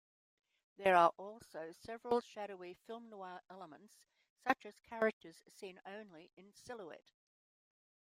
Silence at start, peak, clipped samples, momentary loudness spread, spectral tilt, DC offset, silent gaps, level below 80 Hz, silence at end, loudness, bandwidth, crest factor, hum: 0.8 s; -16 dBFS; under 0.1%; 24 LU; -5 dB/octave; under 0.1%; 4.30-4.36 s, 5.13-5.21 s, 6.33-6.37 s; -82 dBFS; 1.15 s; -37 LUFS; 16 kHz; 26 dB; none